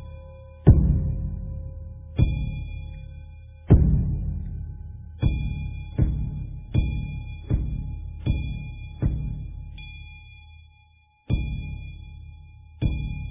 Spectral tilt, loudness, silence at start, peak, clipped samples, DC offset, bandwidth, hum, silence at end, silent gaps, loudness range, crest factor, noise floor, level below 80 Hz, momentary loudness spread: -12 dB/octave; -26 LUFS; 0 s; -2 dBFS; under 0.1%; under 0.1%; 3.7 kHz; none; 0 s; none; 8 LU; 24 dB; -58 dBFS; -28 dBFS; 23 LU